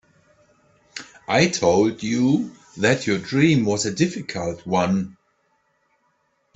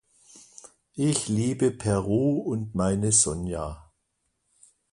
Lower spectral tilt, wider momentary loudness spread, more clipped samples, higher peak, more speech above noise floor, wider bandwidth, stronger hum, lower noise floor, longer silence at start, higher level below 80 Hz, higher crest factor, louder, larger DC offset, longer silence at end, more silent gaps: about the same, -5 dB/octave vs -5 dB/octave; about the same, 17 LU vs 16 LU; neither; about the same, -4 dBFS vs -6 dBFS; second, 47 dB vs 51 dB; second, 8.4 kHz vs 11.5 kHz; neither; second, -67 dBFS vs -76 dBFS; first, 0.95 s vs 0.35 s; second, -58 dBFS vs -48 dBFS; about the same, 20 dB vs 20 dB; first, -21 LUFS vs -25 LUFS; neither; first, 1.45 s vs 1.1 s; neither